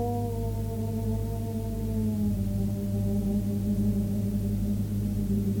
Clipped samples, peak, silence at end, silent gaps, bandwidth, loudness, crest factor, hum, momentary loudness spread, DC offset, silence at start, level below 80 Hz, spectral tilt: under 0.1%; -16 dBFS; 0 s; none; 19 kHz; -29 LUFS; 12 dB; 50 Hz at -40 dBFS; 4 LU; under 0.1%; 0 s; -38 dBFS; -8.5 dB/octave